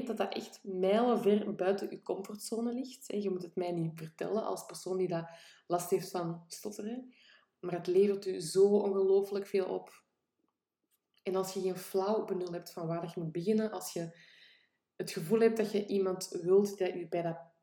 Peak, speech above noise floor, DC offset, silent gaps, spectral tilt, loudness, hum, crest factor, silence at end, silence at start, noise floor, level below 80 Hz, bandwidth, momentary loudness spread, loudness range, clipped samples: -16 dBFS; 51 dB; under 0.1%; none; -5.5 dB/octave; -34 LUFS; none; 18 dB; 0.2 s; 0 s; -84 dBFS; -84 dBFS; 18 kHz; 13 LU; 6 LU; under 0.1%